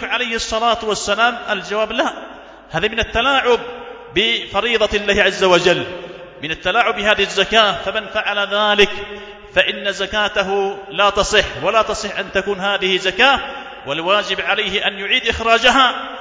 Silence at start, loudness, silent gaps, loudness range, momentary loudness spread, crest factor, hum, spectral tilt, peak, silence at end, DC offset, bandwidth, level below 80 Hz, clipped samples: 0 s; -16 LUFS; none; 3 LU; 10 LU; 18 dB; none; -2.5 dB/octave; 0 dBFS; 0 s; under 0.1%; 8 kHz; -40 dBFS; under 0.1%